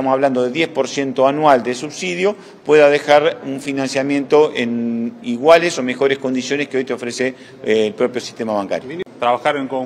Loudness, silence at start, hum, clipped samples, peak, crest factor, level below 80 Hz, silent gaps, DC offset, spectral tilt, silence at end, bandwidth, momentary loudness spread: -17 LUFS; 0 s; none; under 0.1%; 0 dBFS; 16 dB; -64 dBFS; none; under 0.1%; -4.5 dB/octave; 0 s; 12.5 kHz; 11 LU